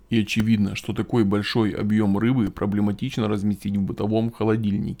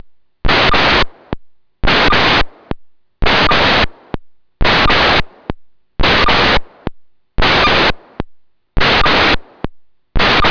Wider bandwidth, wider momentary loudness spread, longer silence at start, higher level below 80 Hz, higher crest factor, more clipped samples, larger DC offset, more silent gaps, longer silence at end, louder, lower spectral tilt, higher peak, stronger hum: first, 15 kHz vs 5.4 kHz; second, 5 LU vs 20 LU; second, 0.1 s vs 0.45 s; second, -50 dBFS vs -24 dBFS; first, 16 dB vs 10 dB; neither; neither; neither; about the same, 0.05 s vs 0 s; second, -23 LUFS vs -12 LUFS; first, -7 dB/octave vs -4.5 dB/octave; second, -8 dBFS vs -4 dBFS; neither